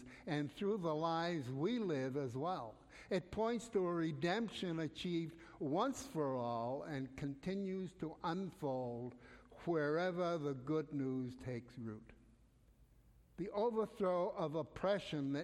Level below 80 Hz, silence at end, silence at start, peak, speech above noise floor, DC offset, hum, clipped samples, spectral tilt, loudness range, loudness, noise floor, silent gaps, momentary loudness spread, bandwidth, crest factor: -68 dBFS; 0 s; 0 s; -24 dBFS; 28 dB; under 0.1%; none; under 0.1%; -6.5 dB/octave; 4 LU; -41 LUFS; -68 dBFS; none; 9 LU; 14.5 kHz; 16 dB